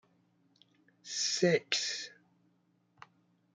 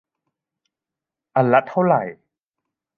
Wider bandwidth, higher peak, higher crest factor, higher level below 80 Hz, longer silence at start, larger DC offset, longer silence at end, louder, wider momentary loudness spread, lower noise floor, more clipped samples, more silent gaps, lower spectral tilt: first, 10.5 kHz vs 4.7 kHz; second, -12 dBFS vs -2 dBFS; first, 26 dB vs 20 dB; second, -86 dBFS vs -72 dBFS; second, 1.05 s vs 1.35 s; neither; first, 1.45 s vs 0.85 s; second, -32 LUFS vs -19 LUFS; first, 17 LU vs 8 LU; second, -73 dBFS vs -87 dBFS; neither; neither; second, -3 dB/octave vs -9.5 dB/octave